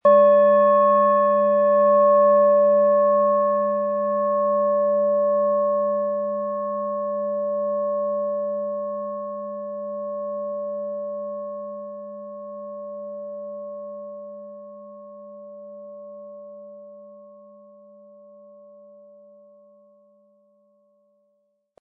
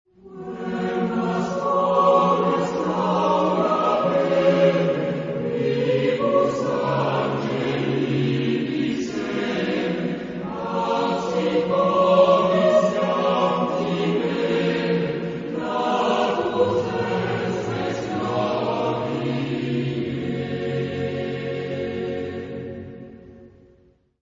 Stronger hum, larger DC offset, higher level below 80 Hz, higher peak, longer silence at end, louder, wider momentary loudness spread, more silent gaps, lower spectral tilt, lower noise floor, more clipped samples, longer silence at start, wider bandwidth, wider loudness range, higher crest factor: neither; neither; second, -88 dBFS vs -56 dBFS; about the same, -6 dBFS vs -4 dBFS; first, 4.5 s vs 0.75 s; about the same, -20 LUFS vs -22 LUFS; first, 24 LU vs 10 LU; neither; first, -10.5 dB/octave vs -7 dB/octave; first, -70 dBFS vs -58 dBFS; neither; second, 0.05 s vs 0.25 s; second, 3.6 kHz vs 7.6 kHz; first, 24 LU vs 7 LU; about the same, 16 dB vs 18 dB